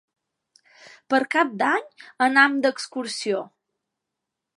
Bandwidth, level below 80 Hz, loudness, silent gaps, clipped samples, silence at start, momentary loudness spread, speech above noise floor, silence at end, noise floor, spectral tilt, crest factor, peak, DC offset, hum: 11.5 kHz; -82 dBFS; -22 LUFS; none; under 0.1%; 1.1 s; 12 LU; 62 dB; 1.1 s; -84 dBFS; -3 dB/octave; 22 dB; -2 dBFS; under 0.1%; none